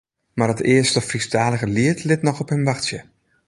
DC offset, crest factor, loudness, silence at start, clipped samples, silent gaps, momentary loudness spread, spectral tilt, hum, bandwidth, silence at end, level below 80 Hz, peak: under 0.1%; 18 dB; -20 LUFS; 0.35 s; under 0.1%; none; 8 LU; -5 dB/octave; none; 11.5 kHz; 0.45 s; -52 dBFS; -2 dBFS